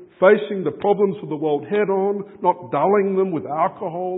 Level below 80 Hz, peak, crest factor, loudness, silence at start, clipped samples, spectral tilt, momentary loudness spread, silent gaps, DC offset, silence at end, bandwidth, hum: -70 dBFS; 0 dBFS; 20 dB; -20 LUFS; 0 s; under 0.1%; -11.5 dB/octave; 7 LU; none; under 0.1%; 0 s; 4 kHz; none